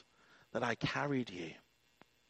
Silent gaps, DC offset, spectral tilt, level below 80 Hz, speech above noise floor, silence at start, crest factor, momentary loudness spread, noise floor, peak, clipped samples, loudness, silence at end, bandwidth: none; under 0.1%; -5.5 dB/octave; -70 dBFS; 31 dB; 0.55 s; 22 dB; 12 LU; -69 dBFS; -20 dBFS; under 0.1%; -39 LUFS; 0.7 s; 8.8 kHz